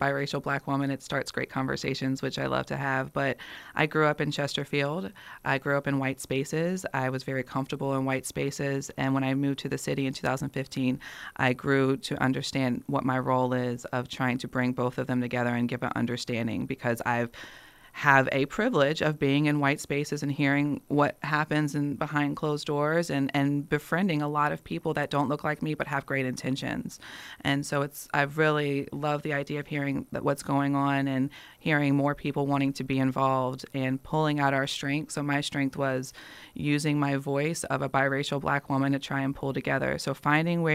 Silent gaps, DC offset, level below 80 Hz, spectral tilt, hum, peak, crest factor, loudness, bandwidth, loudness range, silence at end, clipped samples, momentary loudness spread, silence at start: none; under 0.1%; -60 dBFS; -6 dB/octave; none; -4 dBFS; 24 dB; -28 LUFS; 15.5 kHz; 3 LU; 0 s; under 0.1%; 6 LU; 0 s